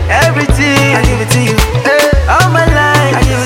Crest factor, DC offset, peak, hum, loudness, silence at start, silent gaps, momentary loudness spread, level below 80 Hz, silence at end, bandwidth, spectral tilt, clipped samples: 8 dB; under 0.1%; 0 dBFS; none; -9 LUFS; 0 s; none; 3 LU; -16 dBFS; 0 s; 17 kHz; -5 dB/octave; under 0.1%